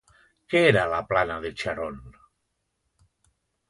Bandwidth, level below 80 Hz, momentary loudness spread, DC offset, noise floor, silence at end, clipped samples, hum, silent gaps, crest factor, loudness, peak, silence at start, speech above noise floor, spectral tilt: 11.5 kHz; -52 dBFS; 14 LU; under 0.1%; -77 dBFS; 1.6 s; under 0.1%; none; none; 22 dB; -24 LUFS; -6 dBFS; 0.5 s; 53 dB; -6 dB/octave